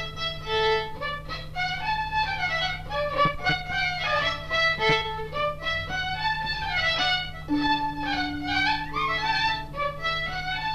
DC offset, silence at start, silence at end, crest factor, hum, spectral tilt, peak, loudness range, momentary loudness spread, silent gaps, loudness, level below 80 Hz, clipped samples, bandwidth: under 0.1%; 0 s; 0 s; 18 dB; none; -4 dB/octave; -8 dBFS; 2 LU; 6 LU; none; -26 LUFS; -42 dBFS; under 0.1%; 14 kHz